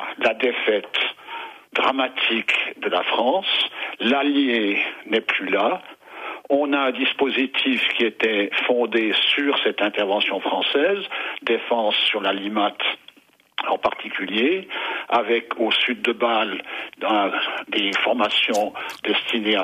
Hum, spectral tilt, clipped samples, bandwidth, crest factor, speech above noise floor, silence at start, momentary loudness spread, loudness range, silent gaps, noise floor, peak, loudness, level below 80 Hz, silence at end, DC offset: none; -3.5 dB/octave; under 0.1%; 15 kHz; 14 dB; 30 dB; 0 s; 8 LU; 3 LU; none; -52 dBFS; -8 dBFS; -21 LUFS; -70 dBFS; 0 s; under 0.1%